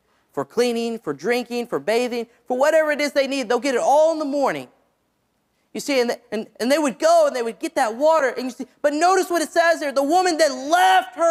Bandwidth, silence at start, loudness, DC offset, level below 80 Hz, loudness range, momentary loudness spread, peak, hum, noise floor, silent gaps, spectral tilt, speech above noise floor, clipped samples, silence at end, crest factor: 16 kHz; 0.35 s; -20 LUFS; under 0.1%; -72 dBFS; 3 LU; 11 LU; -4 dBFS; none; -69 dBFS; none; -3 dB/octave; 49 dB; under 0.1%; 0 s; 16 dB